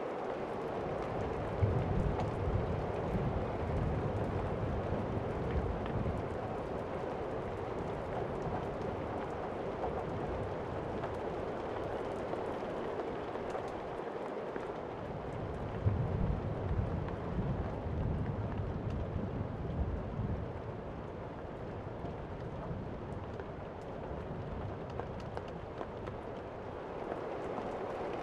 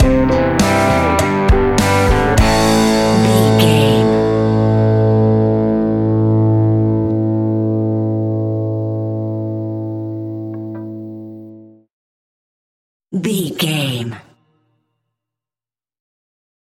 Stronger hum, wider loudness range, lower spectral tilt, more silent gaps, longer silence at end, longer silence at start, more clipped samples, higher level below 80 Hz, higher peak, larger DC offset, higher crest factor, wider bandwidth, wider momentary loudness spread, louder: neither; second, 7 LU vs 14 LU; first, -8.5 dB/octave vs -6 dB/octave; second, none vs 11.93-13.00 s; second, 0 s vs 2.45 s; about the same, 0 s vs 0 s; neither; second, -46 dBFS vs -28 dBFS; second, -18 dBFS vs 0 dBFS; neither; about the same, 18 dB vs 16 dB; second, 10 kHz vs 15.5 kHz; second, 8 LU vs 13 LU; second, -39 LUFS vs -14 LUFS